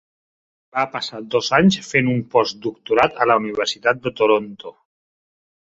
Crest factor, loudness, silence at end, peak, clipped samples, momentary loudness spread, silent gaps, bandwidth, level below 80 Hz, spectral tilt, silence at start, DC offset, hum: 20 dB; -19 LUFS; 0.9 s; -2 dBFS; under 0.1%; 12 LU; none; 8 kHz; -56 dBFS; -5 dB/octave; 0.75 s; under 0.1%; none